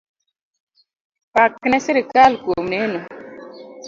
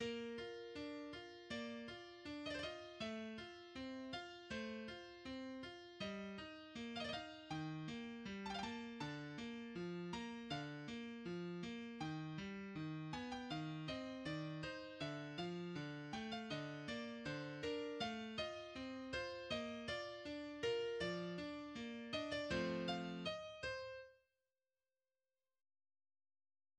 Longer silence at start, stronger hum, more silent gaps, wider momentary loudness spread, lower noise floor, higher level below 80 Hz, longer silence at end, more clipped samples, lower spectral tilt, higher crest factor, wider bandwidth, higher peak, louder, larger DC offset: first, 1.35 s vs 0 s; neither; neither; first, 23 LU vs 7 LU; second, -37 dBFS vs under -90 dBFS; first, -56 dBFS vs -72 dBFS; second, 0 s vs 2.6 s; neither; about the same, -4.5 dB/octave vs -5.5 dB/octave; about the same, 20 dB vs 18 dB; second, 7.6 kHz vs 10.5 kHz; first, 0 dBFS vs -30 dBFS; first, -17 LUFS vs -48 LUFS; neither